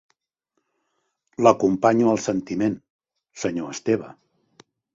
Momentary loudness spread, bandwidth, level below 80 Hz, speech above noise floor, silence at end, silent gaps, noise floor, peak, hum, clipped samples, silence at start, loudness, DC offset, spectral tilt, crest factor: 14 LU; 7.8 kHz; -60 dBFS; 56 dB; 0.85 s; 2.90-2.99 s; -77 dBFS; -2 dBFS; none; under 0.1%; 1.4 s; -22 LUFS; under 0.1%; -6 dB/octave; 24 dB